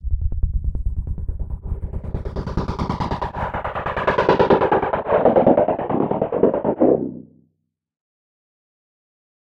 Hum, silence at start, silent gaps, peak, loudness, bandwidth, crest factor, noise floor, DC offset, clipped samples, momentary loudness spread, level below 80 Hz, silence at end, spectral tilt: none; 0.05 s; none; -2 dBFS; -21 LUFS; 7.4 kHz; 20 dB; -71 dBFS; under 0.1%; under 0.1%; 14 LU; -30 dBFS; 2.3 s; -8.5 dB/octave